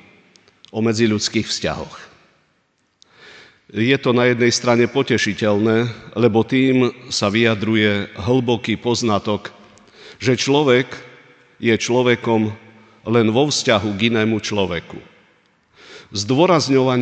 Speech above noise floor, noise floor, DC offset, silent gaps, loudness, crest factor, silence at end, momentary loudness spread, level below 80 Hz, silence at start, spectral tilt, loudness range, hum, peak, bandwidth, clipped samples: 47 dB; -64 dBFS; under 0.1%; none; -18 LUFS; 18 dB; 0 s; 11 LU; -54 dBFS; 0.75 s; -5 dB/octave; 5 LU; none; 0 dBFS; 9.2 kHz; under 0.1%